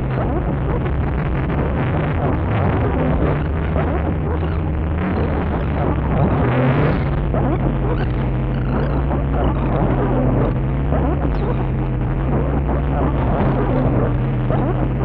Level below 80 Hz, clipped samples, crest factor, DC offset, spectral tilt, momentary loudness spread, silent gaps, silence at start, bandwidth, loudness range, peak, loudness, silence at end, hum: -24 dBFS; under 0.1%; 14 dB; under 0.1%; -11 dB/octave; 3 LU; none; 0 s; 4.6 kHz; 1 LU; -4 dBFS; -19 LUFS; 0 s; none